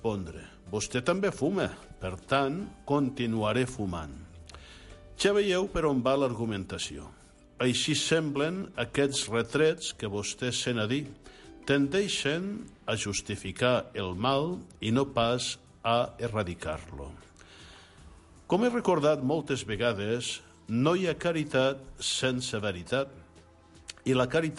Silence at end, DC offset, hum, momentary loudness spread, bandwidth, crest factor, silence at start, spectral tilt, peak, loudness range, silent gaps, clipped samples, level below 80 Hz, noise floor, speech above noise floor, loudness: 0 s; under 0.1%; none; 13 LU; 11.5 kHz; 18 dB; 0 s; -4.5 dB/octave; -12 dBFS; 3 LU; none; under 0.1%; -52 dBFS; -56 dBFS; 27 dB; -29 LUFS